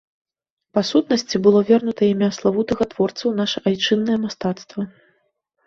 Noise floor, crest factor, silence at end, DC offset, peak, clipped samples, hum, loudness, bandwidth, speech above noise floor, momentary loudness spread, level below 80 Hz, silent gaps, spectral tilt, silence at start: -68 dBFS; 18 dB; 0.8 s; under 0.1%; -2 dBFS; under 0.1%; none; -19 LUFS; 7.6 kHz; 50 dB; 10 LU; -56 dBFS; none; -5.5 dB/octave; 0.75 s